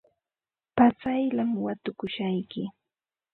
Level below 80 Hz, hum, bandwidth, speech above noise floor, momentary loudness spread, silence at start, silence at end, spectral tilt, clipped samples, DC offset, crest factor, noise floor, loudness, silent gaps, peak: -62 dBFS; none; 4.3 kHz; over 64 dB; 13 LU; 0.75 s; 0.65 s; -9.5 dB/octave; under 0.1%; under 0.1%; 22 dB; under -90 dBFS; -27 LUFS; none; -6 dBFS